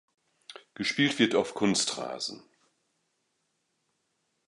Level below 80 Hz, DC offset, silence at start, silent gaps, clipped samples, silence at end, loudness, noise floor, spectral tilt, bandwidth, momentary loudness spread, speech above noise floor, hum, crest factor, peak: -72 dBFS; under 0.1%; 0.5 s; none; under 0.1%; 2.1 s; -28 LUFS; -77 dBFS; -3.5 dB/octave; 11.5 kHz; 22 LU; 49 dB; none; 24 dB; -8 dBFS